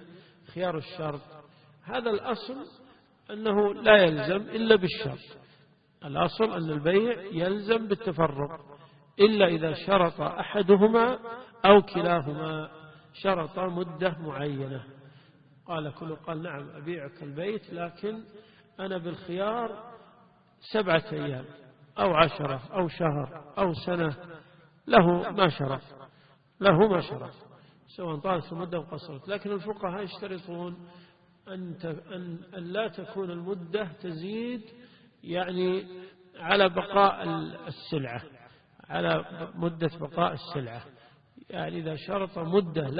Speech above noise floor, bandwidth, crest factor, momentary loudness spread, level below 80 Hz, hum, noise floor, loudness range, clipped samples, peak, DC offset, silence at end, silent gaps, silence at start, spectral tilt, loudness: 33 dB; 5.2 kHz; 28 dB; 18 LU; -60 dBFS; none; -61 dBFS; 12 LU; under 0.1%; -2 dBFS; under 0.1%; 0 s; none; 0 s; -10 dB/octave; -28 LUFS